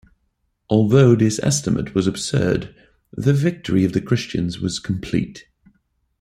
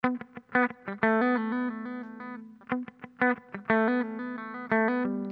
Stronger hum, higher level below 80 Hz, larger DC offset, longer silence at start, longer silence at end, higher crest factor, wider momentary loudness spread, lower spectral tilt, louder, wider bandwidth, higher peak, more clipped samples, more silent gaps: neither; first, -46 dBFS vs -74 dBFS; neither; first, 0.7 s vs 0.05 s; first, 0.8 s vs 0 s; about the same, 18 dB vs 20 dB; second, 11 LU vs 14 LU; second, -6 dB/octave vs -9 dB/octave; first, -19 LUFS vs -29 LUFS; first, 13 kHz vs 5 kHz; first, -2 dBFS vs -10 dBFS; neither; neither